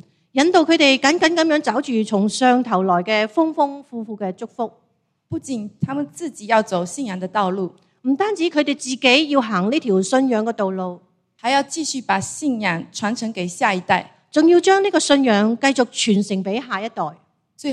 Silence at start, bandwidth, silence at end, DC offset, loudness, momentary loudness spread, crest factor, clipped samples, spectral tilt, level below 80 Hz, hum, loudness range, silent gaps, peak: 0.35 s; 12 kHz; 0 s; under 0.1%; -19 LUFS; 13 LU; 18 dB; under 0.1%; -4 dB/octave; -66 dBFS; none; 7 LU; none; 0 dBFS